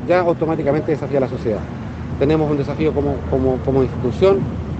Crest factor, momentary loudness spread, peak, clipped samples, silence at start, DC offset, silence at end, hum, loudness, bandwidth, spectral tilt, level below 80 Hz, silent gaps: 16 dB; 7 LU; -2 dBFS; under 0.1%; 0 s; under 0.1%; 0 s; none; -19 LUFS; 8.2 kHz; -9 dB/octave; -34 dBFS; none